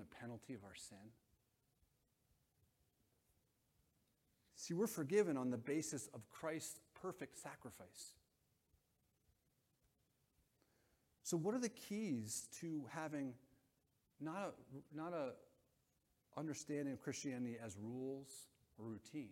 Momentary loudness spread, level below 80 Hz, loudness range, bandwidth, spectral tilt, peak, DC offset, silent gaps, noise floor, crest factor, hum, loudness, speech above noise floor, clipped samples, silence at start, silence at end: 16 LU; -84 dBFS; 16 LU; 16.5 kHz; -5 dB/octave; -26 dBFS; under 0.1%; none; -83 dBFS; 24 dB; none; -47 LUFS; 37 dB; under 0.1%; 0 s; 0 s